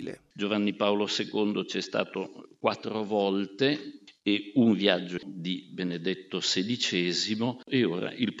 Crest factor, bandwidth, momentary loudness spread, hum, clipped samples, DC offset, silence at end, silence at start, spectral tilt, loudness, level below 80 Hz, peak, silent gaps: 22 dB; 8 kHz; 9 LU; none; under 0.1%; under 0.1%; 0 s; 0 s; -4.5 dB/octave; -29 LUFS; -78 dBFS; -6 dBFS; none